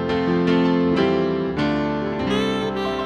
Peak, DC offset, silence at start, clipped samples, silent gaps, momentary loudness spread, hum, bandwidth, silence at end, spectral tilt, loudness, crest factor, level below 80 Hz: -6 dBFS; under 0.1%; 0 s; under 0.1%; none; 5 LU; none; 9.8 kHz; 0 s; -7 dB/octave; -21 LUFS; 14 dB; -44 dBFS